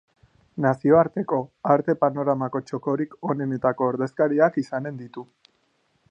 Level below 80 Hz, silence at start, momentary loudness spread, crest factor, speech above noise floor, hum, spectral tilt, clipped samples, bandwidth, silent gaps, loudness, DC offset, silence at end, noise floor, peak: -64 dBFS; 0.55 s; 12 LU; 20 dB; 45 dB; none; -9 dB/octave; under 0.1%; 8.2 kHz; none; -23 LUFS; under 0.1%; 0.9 s; -68 dBFS; -4 dBFS